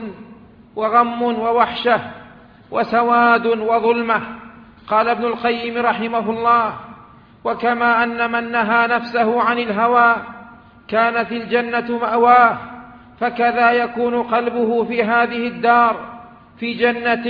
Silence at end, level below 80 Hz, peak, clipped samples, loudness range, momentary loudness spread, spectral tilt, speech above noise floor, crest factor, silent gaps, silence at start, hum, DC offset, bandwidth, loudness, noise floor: 0 s; -56 dBFS; 0 dBFS; under 0.1%; 2 LU; 12 LU; -7.5 dB/octave; 28 dB; 18 dB; none; 0 s; none; under 0.1%; 5.2 kHz; -17 LUFS; -44 dBFS